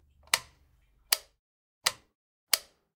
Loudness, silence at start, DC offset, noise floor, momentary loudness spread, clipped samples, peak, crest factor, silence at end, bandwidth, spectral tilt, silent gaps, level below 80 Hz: -30 LUFS; 0.35 s; under 0.1%; -66 dBFS; 2 LU; under 0.1%; 0 dBFS; 36 dB; 0.35 s; 16.5 kHz; 2 dB/octave; 1.39-1.81 s, 2.15-2.47 s; -68 dBFS